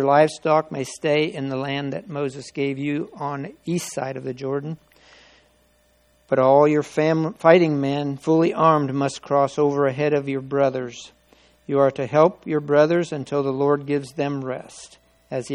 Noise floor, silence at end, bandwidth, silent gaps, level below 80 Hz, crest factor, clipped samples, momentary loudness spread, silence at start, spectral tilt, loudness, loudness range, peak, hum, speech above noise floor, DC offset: -60 dBFS; 0 s; 14 kHz; none; -64 dBFS; 22 dB; under 0.1%; 13 LU; 0 s; -6.5 dB/octave; -21 LUFS; 9 LU; 0 dBFS; none; 40 dB; under 0.1%